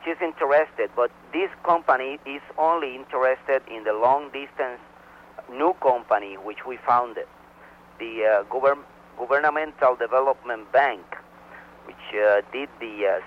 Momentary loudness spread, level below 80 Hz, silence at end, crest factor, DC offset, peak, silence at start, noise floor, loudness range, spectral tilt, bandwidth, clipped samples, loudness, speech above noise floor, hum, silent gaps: 16 LU; -64 dBFS; 0 s; 18 dB; under 0.1%; -6 dBFS; 0 s; -49 dBFS; 3 LU; -5.5 dB/octave; 6.2 kHz; under 0.1%; -24 LUFS; 26 dB; none; none